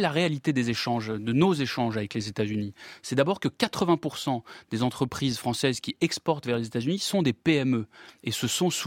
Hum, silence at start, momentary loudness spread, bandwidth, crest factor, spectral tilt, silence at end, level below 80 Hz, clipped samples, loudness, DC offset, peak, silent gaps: none; 0 s; 7 LU; 16.5 kHz; 20 dB; -5 dB/octave; 0 s; -62 dBFS; under 0.1%; -27 LUFS; under 0.1%; -6 dBFS; none